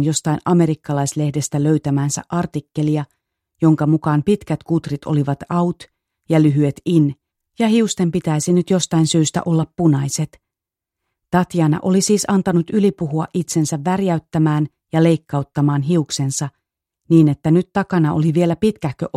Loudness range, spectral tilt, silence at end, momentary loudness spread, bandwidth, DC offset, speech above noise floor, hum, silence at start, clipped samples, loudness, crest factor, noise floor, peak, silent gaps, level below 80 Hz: 2 LU; -6 dB/octave; 0.1 s; 6 LU; 13.5 kHz; under 0.1%; 69 dB; none; 0 s; under 0.1%; -18 LUFS; 16 dB; -85 dBFS; -2 dBFS; none; -52 dBFS